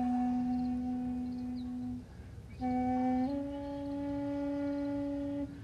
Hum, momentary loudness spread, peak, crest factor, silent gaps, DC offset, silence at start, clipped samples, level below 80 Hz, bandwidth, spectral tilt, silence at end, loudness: none; 9 LU; -24 dBFS; 12 dB; none; under 0.1%; 0 s; under 0.1%; -54 dBFS; 7 kHz; -8.5 dB/octave; 0 s; -36 LUFS